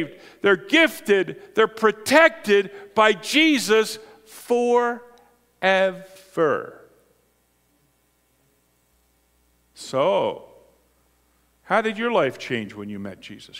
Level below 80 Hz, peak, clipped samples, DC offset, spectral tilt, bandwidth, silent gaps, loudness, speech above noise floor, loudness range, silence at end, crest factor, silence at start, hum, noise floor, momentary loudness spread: -68 dBFS; 0 dBFS; under 0.1%; under 0.1%; -3.5 dB/octave; 16 kHz; none; -20 LUFS; 44 dB; 10 LU; 0 s; 22 dB; 0 s; 60 Hz at -65 dBFS; -65 dBFS; 18 LU